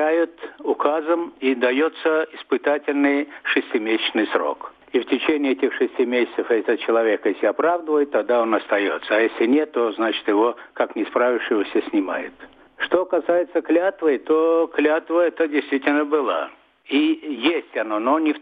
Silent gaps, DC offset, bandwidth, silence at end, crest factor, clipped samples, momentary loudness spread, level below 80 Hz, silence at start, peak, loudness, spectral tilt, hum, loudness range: none; under 0.1%; 4.9 kHz; 0 s; 18 dB; under 0.1%; 5 LU; -70 dBFS; 0 s; -2 dBFS; -21 LUFS; -6.5 dB/octave; none; 2 LU